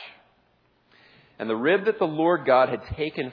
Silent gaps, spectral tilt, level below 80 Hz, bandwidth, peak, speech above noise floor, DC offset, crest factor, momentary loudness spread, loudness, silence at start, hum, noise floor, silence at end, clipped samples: none; -8.5 dB/octave; -52 dBFS; 5.4 kHz; -6 dBFS; 42 dB; under 0.1%; 18 dB; 11 LU; -23 LUFS; 0 s; none; -65 dBFS; 0 s; under 0.1%